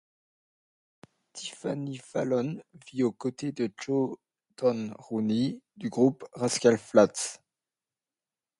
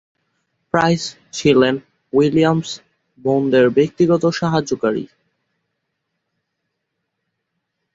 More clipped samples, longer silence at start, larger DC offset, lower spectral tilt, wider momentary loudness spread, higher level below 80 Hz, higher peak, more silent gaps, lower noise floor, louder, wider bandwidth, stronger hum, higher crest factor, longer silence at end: neither; first, 1.35 s vs 0.75 s; neither; about the same, -5 dB/octave vs -6 dB/octave; first, 16 LU vs 13 LU; second, -74 dBFS vs -56 dBFS; second, -8 dBFS vs 0 dBFS; neither; first, under -90 dBFS vs -76 dBFS; second, -29 LUFS vs -17 LUFS; first, 11.5 kHz vs 8 kHz; neither; about the same, 22 dB vs 18 dB; second, 1.25 s vs 2.9 s